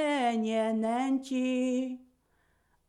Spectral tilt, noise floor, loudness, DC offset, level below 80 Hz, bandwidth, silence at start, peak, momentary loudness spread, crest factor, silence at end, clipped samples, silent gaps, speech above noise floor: -5 dB/octave; -71 dBFS; -30 LUFS; under 0.1%; -76 dBFS; 11 kHz; 0 s; -18 dBFS; 6 LU; 12 dB; 0.85 s; under 0.1%; none; 41 dB